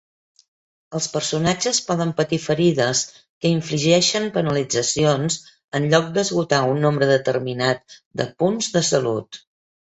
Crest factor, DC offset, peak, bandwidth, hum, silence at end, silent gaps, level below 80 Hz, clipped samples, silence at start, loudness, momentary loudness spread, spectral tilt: 20 dB; under 0.1%; -2 dBFS; 8.4 kHz; none; 0.65 s; 3.29-3.41 s, 5.64-5.68 s, 8.06-8.11 s; -56 dBFS; under 0.1%; 0.9 s; -20 LUFS; 10 LU; -4 dB/octave